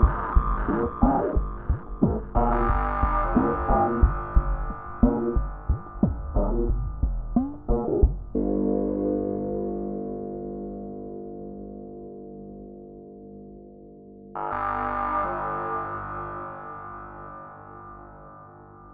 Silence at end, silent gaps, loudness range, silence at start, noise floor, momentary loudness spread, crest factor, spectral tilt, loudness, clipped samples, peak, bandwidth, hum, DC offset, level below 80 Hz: 0 s; none; 13 LU; 0 s; -47 dBFS; 20 LU; 20 dB; -9.5 dB/octave; -27 LUFS; under 0.1%; -6 dBFS; 3.4 kHz; 50 Hz at -45 dBFS; under 0.1%; -30 dBFS